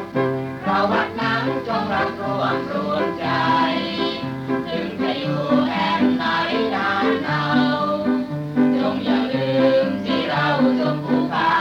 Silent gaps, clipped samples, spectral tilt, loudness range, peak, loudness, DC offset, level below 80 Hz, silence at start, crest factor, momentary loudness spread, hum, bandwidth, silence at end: none; under 0.1%; -7 dB/octave; 2 LU; -6 dBFS; -20 LUFS; under 0.1%; -56 dBFS; 0 s; 14 dB; 5 LU; none; 7.4 kHz; 0 s